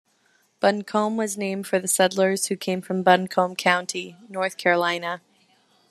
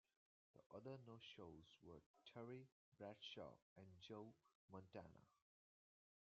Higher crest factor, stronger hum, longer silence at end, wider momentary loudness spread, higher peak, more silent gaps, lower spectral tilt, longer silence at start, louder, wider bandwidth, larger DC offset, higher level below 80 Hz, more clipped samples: about the same, 22 dB vs 20 dB; neither; second, 0.7 s vs 0.9 s; about the same, 10 LU vs 9 LU; first, -2 dBFS vs -44 dBFS; second, none vs 0.66-0.70 s, 2.06-2.14 s, 2.72-2.92 s, 3.62-3.76 s, 4.55-4.68 s; about the same, -3.5 dB/octave vs -4.5 dB/octave; about the same, 0.6 s vs 0.55 s; first, -23 LUFS vs -61 LUFS; first, 14 kHz vs 7 kHz; neither; first, -74 dBFS vs -88 dBFS; neither